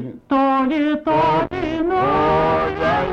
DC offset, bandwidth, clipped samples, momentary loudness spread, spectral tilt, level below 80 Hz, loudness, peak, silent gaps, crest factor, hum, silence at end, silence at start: under 0.1%; 7.6 kHz; under 0.1%; 4 LU; -7.5 dB/octave; -40 dBFS; -18 LUFS; -10 dBFS; none; 8 dB; none; 0 s; 0 s